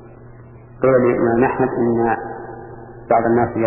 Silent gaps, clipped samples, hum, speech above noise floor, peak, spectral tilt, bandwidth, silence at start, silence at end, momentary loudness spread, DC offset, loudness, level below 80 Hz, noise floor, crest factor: none; under 0.1%; none; 24 dB; -2 dBFS; -13 dB/octave; 2.9 kHz; 0 s; 0 s; 19 LU; under 0.1%; -17 LUFS; -46 dBFS; -40 dBFS; 16 dB